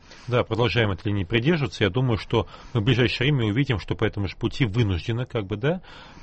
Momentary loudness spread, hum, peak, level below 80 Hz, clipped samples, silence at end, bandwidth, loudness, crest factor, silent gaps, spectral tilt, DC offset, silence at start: 7 LU; none; -6 dBFS; -44 dBFS; under 0.1%; 0 s; 8.4 kHz; -24 LUFS; 16 dB; none; -7 dB/octave; under 0.1%; 0.1 s